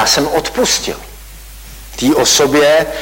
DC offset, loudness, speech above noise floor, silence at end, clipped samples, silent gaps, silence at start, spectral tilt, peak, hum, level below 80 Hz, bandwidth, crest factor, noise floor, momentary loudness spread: under 0.1%; -12 LUFS; 21 dB; 0 s; under 0.1%; none; 0 s; -2 dB/octave; -2 dBFS; none; -36 dBFS; 16.5 kHz; 12 dB; -33 dBFS; 19 LU